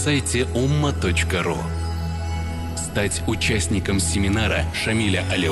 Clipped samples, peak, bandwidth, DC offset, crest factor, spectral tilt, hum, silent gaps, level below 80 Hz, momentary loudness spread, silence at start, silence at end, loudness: under 0.1%; -8 dBFS; 12.5 kHz; under 0.1%; 14 dB; -4.5 dB/octave; none; none; -30 dBFS; 7 LU; 0 s; 0 s; -22 LUFS